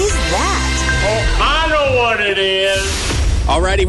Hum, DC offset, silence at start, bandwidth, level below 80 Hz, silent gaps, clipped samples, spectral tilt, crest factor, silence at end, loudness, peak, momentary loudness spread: none; under 0.1%; 0 s; 12 kHz; -20 dBFS; none; under 0.1%; -3.5 dB/octave; 10 dB; 0 s; -15 LUFS; -6 dBFS; 3 LU